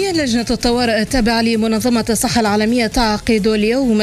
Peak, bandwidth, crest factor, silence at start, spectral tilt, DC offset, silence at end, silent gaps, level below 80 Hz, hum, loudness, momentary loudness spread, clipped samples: -2 dBFS; 15 kHz; 12 dB; 0 s; -4 dB/octave; under 0.1%; 0 s; none; -32 dBFS; none; -15 LUFS; 2 LU; under 0.1%